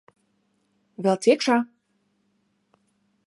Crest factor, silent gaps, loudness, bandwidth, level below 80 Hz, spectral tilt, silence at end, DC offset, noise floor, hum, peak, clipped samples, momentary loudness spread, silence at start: 20 dB; none; -22 LUFS; 11.5 kHz; -82 dBFS; -5 dB/octave; 1.6 s; under 0.1%; -70 dBFS; none; -6 dBFS; under 0.1%; 9 LU; 1 s